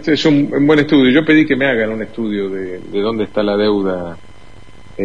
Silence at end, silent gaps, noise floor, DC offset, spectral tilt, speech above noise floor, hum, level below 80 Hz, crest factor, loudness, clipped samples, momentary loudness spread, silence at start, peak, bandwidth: 0 s; none; -41 dBFS; 2%; -6.5 dB/octave; 27 dB; none; -46 dBFS; 14 dB; -14 LUFS; under 0.1%; 12 LU; 0 s; 0 dBFS; 7.6 kHz